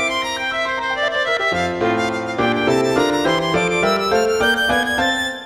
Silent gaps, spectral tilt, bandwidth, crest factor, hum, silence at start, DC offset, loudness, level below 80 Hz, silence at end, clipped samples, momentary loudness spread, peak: none; -4 dB/octave; 16 kHz; 14 dB; none; 0 s; 0.1%; -18 LUFS; -46 dBFS; 0 s; under 0.1%; 4 LU; -4 dBFS